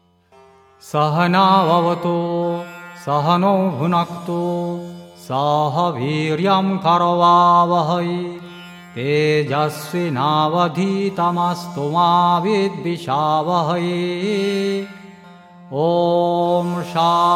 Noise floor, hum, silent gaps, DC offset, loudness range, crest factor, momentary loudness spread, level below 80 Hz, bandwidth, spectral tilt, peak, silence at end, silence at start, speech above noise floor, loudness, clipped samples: -50 dBFS; none; none; under 0.1%; 4 LU; 16 dB; 12 LU; -66 dBFS; 15 kHz; -6.5 dB/octave; -2 dBFS; 0 s; 0.85 s; 33 dB; -18 LUFS; under 0.1%